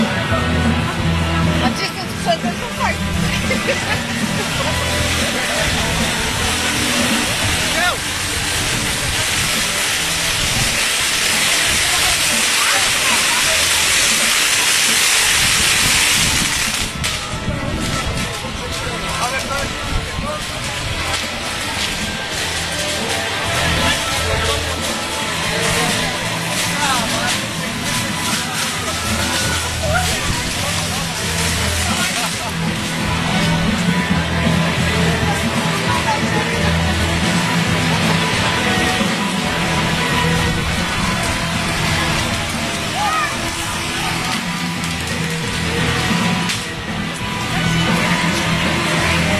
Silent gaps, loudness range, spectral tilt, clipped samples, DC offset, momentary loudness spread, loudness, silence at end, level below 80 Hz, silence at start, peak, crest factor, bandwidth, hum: none; 7 LU; -3 dB/octave; under 0.1%; under 0.1%; 8 LU; -16 LUFS; 0 s; -32 dBFS; 0 s; 0 dBFS; 18 dB; 14 kHz; none